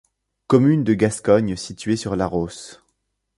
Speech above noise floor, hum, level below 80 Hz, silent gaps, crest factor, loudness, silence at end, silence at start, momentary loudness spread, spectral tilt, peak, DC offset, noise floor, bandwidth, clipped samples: 53 dB; none; -48 dBFS; none; 18 dB; -20 LUFS; 0.65 s; 0.5 s; 13 LU; -6.5 dB/octave; -2 dBFS; under 0.1%; -72 dBFS; 11.5 kHz; under 0.1%